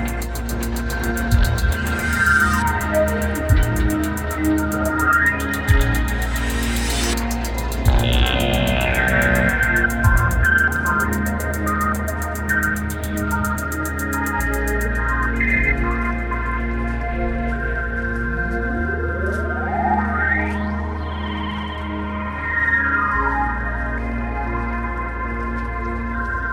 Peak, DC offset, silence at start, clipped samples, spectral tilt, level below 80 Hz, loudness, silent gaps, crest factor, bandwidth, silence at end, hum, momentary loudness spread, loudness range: -2 dBFS; under 0.1%; 0 s; under 0.1%; -5 dB/octave; -24 dBFS; -20 LUFS; none; 16 dB; 18 kHz; 0 s; none; 9 LU; 5 LU